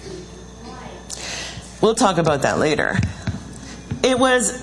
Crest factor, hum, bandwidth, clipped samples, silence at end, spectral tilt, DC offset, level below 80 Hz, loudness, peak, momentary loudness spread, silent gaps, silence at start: 20 dB; none; 12 kHz; under 0.1%; 0 s; -4 dB/octave; under 0.1%; -42 dBFS; -19 LUFS; -2 dBFS; 20 LU; none; 0 s